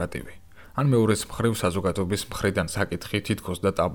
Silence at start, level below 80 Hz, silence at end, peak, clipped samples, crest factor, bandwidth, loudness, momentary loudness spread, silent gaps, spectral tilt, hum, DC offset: 0 s; -46 dBFS; 0 s; -10 dBFS; under 0.1%; 16 dB; over 20 kHz; -26 LUFS; 10 LU; none; -5.5 dB/octave; none; under 0.1%